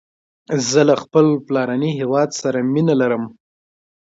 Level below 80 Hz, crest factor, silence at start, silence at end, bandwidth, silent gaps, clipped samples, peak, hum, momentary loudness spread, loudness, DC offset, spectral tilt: -64 dBFS; 18 dB; 0.5 s; 0.75 s; 7.8 kHz; none; under 0.1%; -2 dBFS; none; 7 LU; -17 LUFS; under 0.1%; -5.5 dB/octave